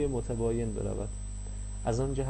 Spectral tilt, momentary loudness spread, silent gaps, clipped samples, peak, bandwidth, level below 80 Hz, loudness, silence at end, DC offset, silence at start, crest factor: -7 dB/octave; 10 LU; none; under 0.1%; -18 dBFS; 8.6 kHz; -38 dBFS; -34 LUFS; 0 s; under 0.1%; 0 s; 14 dB